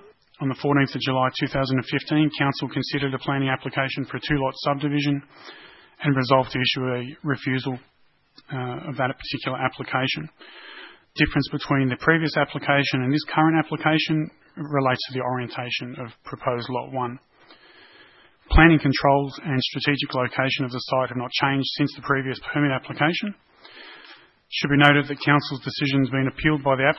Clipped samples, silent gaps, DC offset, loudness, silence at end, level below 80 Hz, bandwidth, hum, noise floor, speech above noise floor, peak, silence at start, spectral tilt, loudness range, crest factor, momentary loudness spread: under 0.1%; none; under 0.1%; -23 LUFS; 0 s; -38 dBFS; 6 kHz; none; -53 dBFS; 30 dB; 0 dBFS; 0.4 s; -7 dB/octave; 6 LU; 24 dB; 12 LU